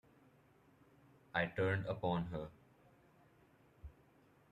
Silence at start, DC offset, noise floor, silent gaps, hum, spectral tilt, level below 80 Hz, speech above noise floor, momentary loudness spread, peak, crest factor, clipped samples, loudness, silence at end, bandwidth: 1.35 s; under 0.1%; -69 dBFS; none; none; -8 dB/octave; -66 dBFS; 31 dB; 23 LU; -22 dBFS; 22 dB; under 0.1%; -40 LUFS; 0.6 s; 13 kHz